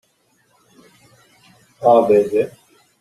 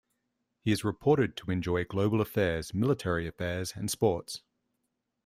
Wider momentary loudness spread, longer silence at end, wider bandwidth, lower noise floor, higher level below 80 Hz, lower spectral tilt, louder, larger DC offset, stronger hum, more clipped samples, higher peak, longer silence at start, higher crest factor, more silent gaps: about the same, 9 LU vs 7 LU; second, 0.55 s vs 0.85 s; second, 13 kHz vs 16 kHz; second, -61 dBFS vs -82 dBFS; second, -62 dBFS vs -56 dBFS; about the same, -7 dB/octave vs -6 dB/octave; first, -16 LUFS vs -30 LUFS; neither; neither; neither; first, -2 dBFS vs -12 dBFS; first, 1.8 s vs 0.65 s; about the same, 18 dB vs 20 dB; neither